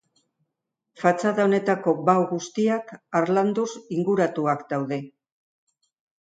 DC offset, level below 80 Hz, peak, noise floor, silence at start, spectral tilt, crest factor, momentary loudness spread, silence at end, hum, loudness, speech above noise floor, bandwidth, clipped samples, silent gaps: under 0.1%; -74 dBFS; -4 dBFS; -82 dBFS; 1 s; -6.5 dB/octave; 20 dB; 7 LU; 1.15 s; none; -24 LUFS; 59 dB; 9.2 kHz; under 0.1%; none